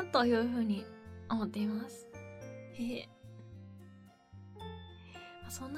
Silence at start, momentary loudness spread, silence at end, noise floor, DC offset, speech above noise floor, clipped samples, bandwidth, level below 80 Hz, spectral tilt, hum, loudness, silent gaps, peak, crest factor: 0 s; 23 LU; 0 s; -58 dBFS; under 0.1%; 24 dB; under 0.1%; 15.5 kHz; -64 dBFS; -5.5 dB/octave; none; -36 LUFS; none; -16 dBFS; 22 dB